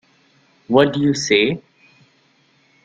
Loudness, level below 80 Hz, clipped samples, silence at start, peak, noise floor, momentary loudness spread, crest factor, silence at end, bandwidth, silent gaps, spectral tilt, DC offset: -17 LUFS; -58 dBFS; under 0.1%; 0.7 s; -2 dBFS; -58 dBFS; 5 LU; 18 dB; 1.25 s; 9 kHz; none; -4.5 dB/octave; under 0.1%